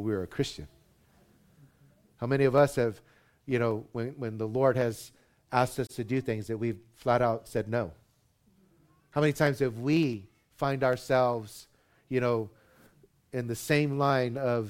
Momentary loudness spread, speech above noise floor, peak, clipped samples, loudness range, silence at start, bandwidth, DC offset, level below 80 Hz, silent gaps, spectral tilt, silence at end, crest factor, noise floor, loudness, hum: 13 LU; 39 dB; -10 dBFS; under 0.1%; 2 LU; 0 s; 16.5 kHz; under 0.1%; -60 dBFS; none; -6.5 dB/octave; 0 s; 20 dB; -67 dBFS; -29 LUFS; none